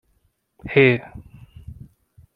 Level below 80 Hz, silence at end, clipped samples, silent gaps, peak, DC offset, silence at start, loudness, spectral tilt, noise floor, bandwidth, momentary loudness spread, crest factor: -50 dBFS; 0.65 s; under 0.1%; none; -2 dBFS; under 0.1%; 0.65 s; -18 LUFS; -9 dB/octave; -66 dBFS; 4.9 kHz; 26 LU; 22 dB